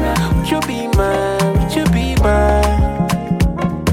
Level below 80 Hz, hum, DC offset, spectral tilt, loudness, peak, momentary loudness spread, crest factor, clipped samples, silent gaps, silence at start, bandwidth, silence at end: -20 dBFS; none; under 0.1%; -6 dB/octave; -16 LUFS; -4 dBFS; 5 LU; 12 dB; under 0.1%; none; 0 s; 16.5 kHz; 0 s